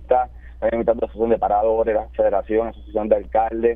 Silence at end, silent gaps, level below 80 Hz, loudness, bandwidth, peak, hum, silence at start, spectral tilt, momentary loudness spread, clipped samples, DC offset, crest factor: 0 s; none; -38 dBFS; -21 LUFS; 3.8 kHz; -4 dBFS; none; 0 s; -10 dB/octave; 7 LU; under 0.1%; under 0.1%; 16 dB